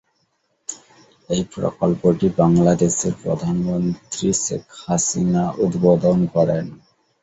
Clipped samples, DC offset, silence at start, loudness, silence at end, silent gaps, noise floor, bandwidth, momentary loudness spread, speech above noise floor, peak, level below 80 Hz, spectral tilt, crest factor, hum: under 0.1%; under 0.1%; 0.7 s; -19 LUFS; 0.45 s; none; -68 dBFS; 8.2 kHz; 14 LU; 49 dB; -2 dBFS; -48 dBFS; -6 dB/octave; 18 dB; none